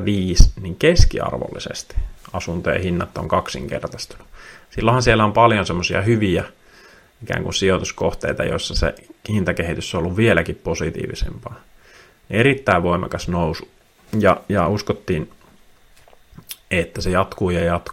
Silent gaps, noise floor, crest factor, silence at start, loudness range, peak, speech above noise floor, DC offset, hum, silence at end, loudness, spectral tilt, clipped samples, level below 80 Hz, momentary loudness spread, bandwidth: none; -50 dBFS; 20 dB; 0 s; 5 LU; 0 dBFS; 31 dB; under 0.1%; none; 0 s; -20 LUFS; -5.5 dB/octave; 0.1%; -28 dBFS; 15 LU; 16 kHz